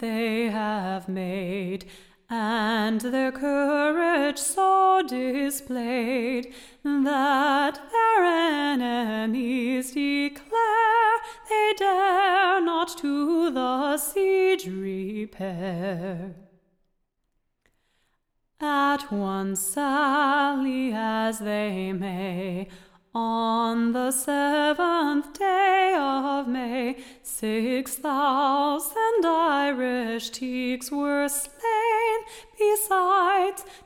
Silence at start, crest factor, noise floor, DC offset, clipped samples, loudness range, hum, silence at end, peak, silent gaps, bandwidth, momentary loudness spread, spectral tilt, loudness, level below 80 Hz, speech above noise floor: 0 s; 14 dB; -74 dBFS; under 0.1%; under 0.1%; 5 LU; none; 0.1 s; -10 dBFS; none; 17.5 kHz; 10 LU; -4 dB/octave; -24 LUFS; -60 dBFS; 50 dB